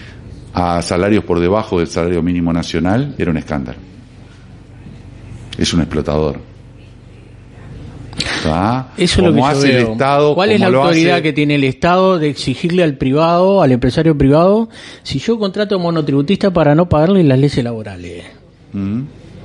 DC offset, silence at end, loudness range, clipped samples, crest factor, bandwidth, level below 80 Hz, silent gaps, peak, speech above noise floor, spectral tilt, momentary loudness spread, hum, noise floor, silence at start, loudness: under 0.1%; 0 s; 9 LU; under 0.1%; 14 dB; 11.5 kHz; -36 dBFS; none; 0 dBFS; 24 dB; -6.5 dB/octave; 18 LU; none; -38 dBFS; 0 s; -14 LUFS